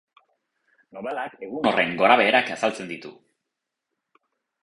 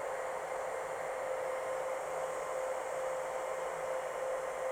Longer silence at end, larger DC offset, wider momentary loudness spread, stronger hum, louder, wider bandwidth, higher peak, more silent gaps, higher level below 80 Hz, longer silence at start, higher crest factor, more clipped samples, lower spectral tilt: first, 1.5 s vs 0 s; neither; first, 19 LU vs 1 LU; neither; first, -22 LUFS vs -38 LUFS; second, 11.5 kHz vs 18 kHz; first, -4 dBFS vs -26 dBFS; neither; about the same, -68 dBFS vs -70 dBFS; first, 0.95 s vs 0 s; first, 22 dB vs 12 dB; neither; first, -4 dB/octave vs -2.5 dB/octave